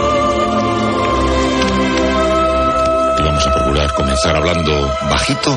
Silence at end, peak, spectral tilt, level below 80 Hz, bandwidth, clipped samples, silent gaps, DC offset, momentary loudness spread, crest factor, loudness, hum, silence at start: 0 s; -2 dBFS; -5 dB/octave; -24 dBFS; 11 kHz; under 0.1%; none; under 0.1%; 2 LU; 12 dB; -14 LUFS; none; 0 s